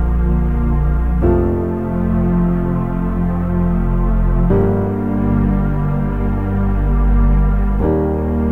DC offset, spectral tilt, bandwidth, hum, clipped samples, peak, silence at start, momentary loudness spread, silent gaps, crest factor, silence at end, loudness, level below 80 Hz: 2%; -11.5 dB/octave; 3.2 kHz; none; under 0.1%; -2 dBFS; 0 s; 4 LU; none; 12 dB; 0 s; -17 LUFS; -18 dBFS